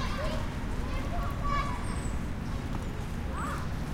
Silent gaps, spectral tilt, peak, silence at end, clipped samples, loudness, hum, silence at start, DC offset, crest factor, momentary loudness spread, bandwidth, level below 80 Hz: none; -6 dB/octave; -18 dBFS; 0 s; under 0.1%; -35 LUFS; none; 0 s; under 0.1%; 14 dB; 5 LU; 16.5 kHz; -36 dBFS